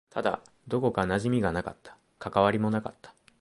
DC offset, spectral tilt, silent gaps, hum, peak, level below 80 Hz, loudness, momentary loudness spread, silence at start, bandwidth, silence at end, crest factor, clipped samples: under 0.1%; -7 dB/octave; none; none; -6 dBFS; -54 dBFS; -28 LUFS; 14 LU; 0.15 s; 11.5 kHz; 0.3 s; 22 dB; under 0.1%